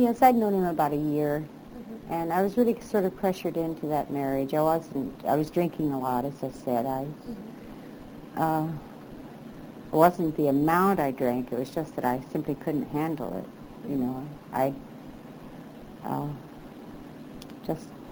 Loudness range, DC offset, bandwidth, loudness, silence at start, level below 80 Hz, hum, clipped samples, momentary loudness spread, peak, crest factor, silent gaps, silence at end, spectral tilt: 8 LU; under 0.1%; over 20 kHz; -28 LUFS; 0 s; -56 dBFS; none; under 0.1%; 21 LU; -6 dBFS; 22 dB; none; 0 s; -7.5 dB/octave